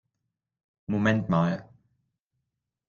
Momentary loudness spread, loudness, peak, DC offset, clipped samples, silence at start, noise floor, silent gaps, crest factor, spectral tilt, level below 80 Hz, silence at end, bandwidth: 12 LU; -27 LUFS; -10 dBFS; under 0.1%; under 0.1%; 0.9 s; -84 dBFS; none; 20 dB; -8 dB/octave; -62 dBFS; 1.25 s; 7.2 kHz